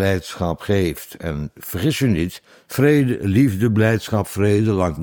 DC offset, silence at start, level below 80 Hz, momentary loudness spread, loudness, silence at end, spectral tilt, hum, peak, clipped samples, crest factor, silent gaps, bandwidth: under 0.1%; 0 s; -42 dBFS; 12 LU; -19 LUFS; 0 s; -6.5 dB/octave; none; -2 dBFS; under 0.1%; 16 dB; none; 19.5 kHz